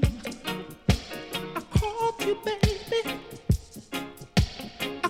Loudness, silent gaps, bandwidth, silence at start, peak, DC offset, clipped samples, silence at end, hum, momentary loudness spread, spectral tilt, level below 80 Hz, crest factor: -29 LUFS; none; 16.5 kHz; 0 s; -10 dBFS; under 0.1%; under 0.1%; 0 s; none; 9 LU; -5.5 dB/octave; -36 dBFS; 20 dB